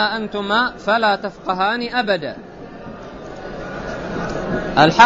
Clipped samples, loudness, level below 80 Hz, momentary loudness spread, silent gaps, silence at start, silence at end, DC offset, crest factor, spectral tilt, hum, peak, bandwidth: under 0.1%; -20 LUFS; -42 dBFS; 18 LU; none; 0 s; 0 s; under 0.1%; 18 dB; -5 dB/octave; none; 0 dBFS; 8 kHz